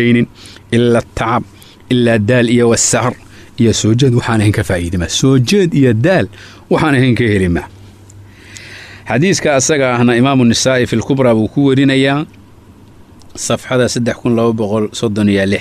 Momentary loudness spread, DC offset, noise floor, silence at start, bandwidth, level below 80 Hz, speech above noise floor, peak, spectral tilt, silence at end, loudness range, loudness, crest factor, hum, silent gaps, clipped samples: 10 LU; under 0.1%; -40 dBFS; 0 s; 14 kHz; -40 dBFS; 28 dB; -2 dBFS; -5 dB/octave; 0 s; 4 LU; -12 LUFS; 10 dB; none; none; under 0.1%